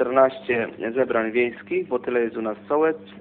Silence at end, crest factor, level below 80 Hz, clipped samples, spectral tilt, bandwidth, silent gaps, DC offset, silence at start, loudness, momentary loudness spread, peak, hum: 0 s; 18 dB; -64 dBFS; under 0.1%; -10 dB/octave; 4.3 kHz; none; under 0.1%; 0 s; -23 LUFS; 7 LU; -4 dBFS; none